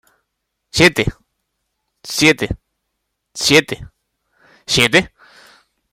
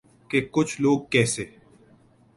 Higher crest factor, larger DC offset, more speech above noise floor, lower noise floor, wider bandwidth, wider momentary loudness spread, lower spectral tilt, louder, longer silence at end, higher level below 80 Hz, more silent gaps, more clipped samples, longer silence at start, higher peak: about the same, 20 dB vs 20 dB; neither; first, 60 dB vs 34 dB; first, -75 dBFS vs -57 dBFS; first, 16.5 kHz vs 11.5 kHz; first, 20 LU vs 8 LU; about the same, -3.5 dB/octave vs -4.5 dB/octave; first, -14 LUFS vs -24 LUFS; about the same, 0.85 s vs 0.9 s; first, -42 dBFS vs -58 dBFS; neither; neither; first, 0.75 s vs 0.3 s; first, 0 dBFS vs -4 dBFS